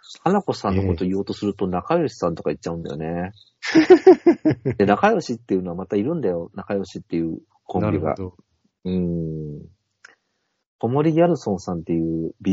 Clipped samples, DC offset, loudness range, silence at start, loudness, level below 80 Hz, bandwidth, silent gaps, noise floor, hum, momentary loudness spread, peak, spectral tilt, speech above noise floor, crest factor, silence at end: under 0.1%; under 0.1%; 9 LU; 0.1 s; -21 LUFS; -50 dBFS; 7.8 kHz; 10.67-10.79 s; -73 dBFS; none; 13 LU; 0 dBFS; -6.5 dB/octave; 53 dB; 20 dB; 0 s